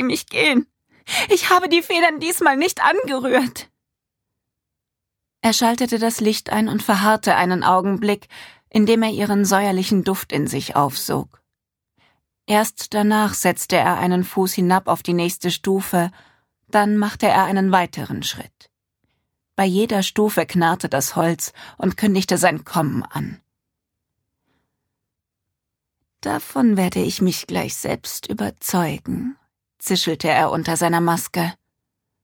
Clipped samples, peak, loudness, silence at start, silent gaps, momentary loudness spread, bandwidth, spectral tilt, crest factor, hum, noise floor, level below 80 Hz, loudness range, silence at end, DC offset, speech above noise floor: under 0.1%; -2 dBFS; -19 LUFS; 0 s; none; 10 LU; 19.5 kHz; -4.5 dB/octave; 18 dB; none; -82 dBFS; -56 dBFS; 5 LU; 0.7 s; under 0.1%; 63 dB